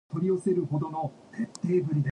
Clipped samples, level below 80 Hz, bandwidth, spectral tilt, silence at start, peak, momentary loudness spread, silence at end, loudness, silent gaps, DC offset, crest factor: under 0.1%; -66 dBFS; 10.5 kHz; -8.5 dB/octave; 0.1 s; -16 dBFS; 10 LU; 0 s; -29 LUFS; none; under 0.1%; 14 dB